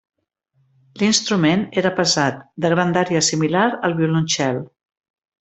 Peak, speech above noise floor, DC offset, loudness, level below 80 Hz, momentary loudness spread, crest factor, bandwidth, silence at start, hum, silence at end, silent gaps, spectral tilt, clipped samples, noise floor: -2 dBFS; 47 dB; under 0.1%; -18 LUFS; -58 dBFS; 5 LU; 18 dB; 8.4 kHz; 0.95 s; none; 0.75 s; none; -4 dB/octave; under 0.1%; -66 dBFS